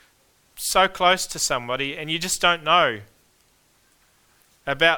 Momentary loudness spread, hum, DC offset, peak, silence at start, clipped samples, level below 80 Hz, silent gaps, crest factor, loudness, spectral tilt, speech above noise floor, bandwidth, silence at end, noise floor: 12 LU; none; under 0.1%; -2 dBFS; 0.55 s; under 0.1%; -52 dBFS; none; 22 dB; -21 LUFS; -1.5 dB/octave; 40 dB; 20 kHz; 0 s; -61 dBFS